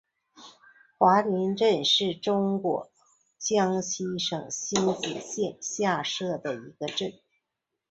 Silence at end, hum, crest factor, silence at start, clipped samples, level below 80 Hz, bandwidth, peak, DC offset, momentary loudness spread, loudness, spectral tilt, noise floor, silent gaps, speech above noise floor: 0.8 s; none; 22 dB; 0.4 s; under 0.1%; -70 dBFS; 8.2 kHz; -6 dBFS; under 0.1%; 11 LU; -27 LUFS; -3.5 dB/octave; -84 dBFS; none; 58 dB